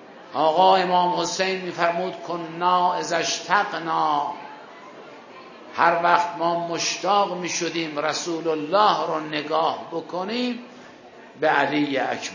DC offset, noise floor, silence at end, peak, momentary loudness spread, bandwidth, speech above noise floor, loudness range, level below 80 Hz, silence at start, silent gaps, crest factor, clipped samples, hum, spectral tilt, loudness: under 0.1%; -45 dBFS; 0 s; -2 dBFS; 17 LU; 7.4 kHz; 23 dB; 3 LU; -76 dBFS; 0 s; none; 22 dB; under 0.1%; none; -3 dB/octave; -22 LUFS